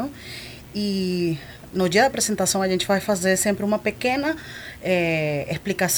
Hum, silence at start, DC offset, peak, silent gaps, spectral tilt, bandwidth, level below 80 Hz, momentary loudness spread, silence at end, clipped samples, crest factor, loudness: none; 0 s; under 0.1%; -6 dBFS; none; -4 dB/octave; over 20 kHz; -52 dBFS; 12 LU; 0 s; under 0.1%; 18 dB; -22 LUFS